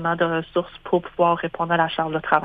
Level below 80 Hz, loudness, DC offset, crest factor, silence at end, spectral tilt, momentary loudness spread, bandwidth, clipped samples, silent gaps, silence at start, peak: -54 dBFS; -22 LUFS; under 0.1%; 22 dB; 0 s; -8.5 dB/octave; 4 LU; 4.9 kHz; under 0.1%; none; 0 s; 0 dBFS